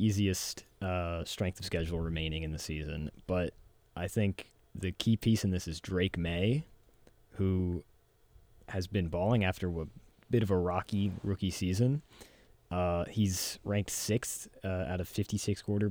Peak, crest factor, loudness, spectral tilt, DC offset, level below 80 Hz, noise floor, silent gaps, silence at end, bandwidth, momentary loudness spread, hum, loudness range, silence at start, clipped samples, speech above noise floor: -16 dBFS; 18 dB; -34 LUFS; -5.5 dB/octave; under 0.1%; -50 dBFS; -63 dBFS; none; 0 s; 20 kHz; 10 LU; none; 3 LU; 0 s; under 0.1%; 30 dB